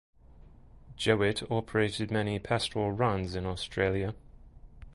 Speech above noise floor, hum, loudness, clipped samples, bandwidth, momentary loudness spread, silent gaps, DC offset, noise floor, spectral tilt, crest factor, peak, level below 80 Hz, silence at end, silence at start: 24 dB; none; -30 LUFS; under 0.1%; 11.5 kHz; 7 LU; none; under 0.1%; -54 dBFS; -5.5 dB/octave; 22 dB; -10 dBFS; -50 dBFS; 0 s; 0.35 s